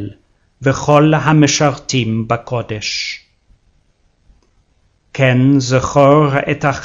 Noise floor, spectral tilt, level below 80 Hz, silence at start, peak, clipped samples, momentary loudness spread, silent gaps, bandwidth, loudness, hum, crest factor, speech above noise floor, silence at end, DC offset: -57 dBFS; -5.5 dB/octave; -44 dBFS; 0 s; 0 dBFS; under 0.1%; 11 LU; none; 7.8 kHz; -14 LUFS; none; 14 dB; 45 dB; 0 s; under 0.1%